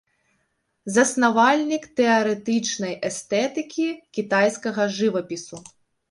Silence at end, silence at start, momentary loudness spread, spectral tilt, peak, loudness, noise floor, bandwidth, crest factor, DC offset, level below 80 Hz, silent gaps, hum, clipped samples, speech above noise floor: 0.5 s; 0.85 s; 12 LU; -3.5 dB/octave; -4 dBFS; -22 LUFS; -72 dBFS; 11.5 kHz; 20 dB; under 0.1%; -68 dBFS; none; none; under 0.1%; 50 dB